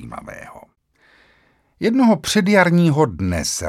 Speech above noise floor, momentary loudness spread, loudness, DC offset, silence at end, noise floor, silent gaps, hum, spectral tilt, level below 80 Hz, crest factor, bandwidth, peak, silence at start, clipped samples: 42 dB; 20 LU; -16 LUFS; under 0.1%; 0 s; -58 dBFS; none; none; -5 dB/octave; -44 dBFS; 18 dB; 15 kHz; 0 dBFS; 0 s; under 0.1%